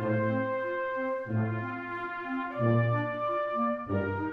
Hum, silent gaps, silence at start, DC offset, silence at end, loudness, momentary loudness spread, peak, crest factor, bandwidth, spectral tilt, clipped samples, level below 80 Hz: none; none; 0 s; under 0.1%; 0 s; -31 LUFS; 8 LU; -14 dBFS; 16 dB; 5 kHz; -10 dB/octave; under 0.1%; -66 dBFS